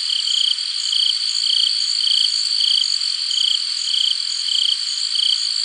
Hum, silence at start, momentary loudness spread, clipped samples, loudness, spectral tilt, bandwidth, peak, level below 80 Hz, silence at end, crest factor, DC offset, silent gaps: none; 0 s; 4 LU; under 0.1%; -16 LUFS; 8.5 dB/octave; 11.5 kHz; -2 dBFS; under -90 dBFS; 0 s; 16 dB; under 0.1%; none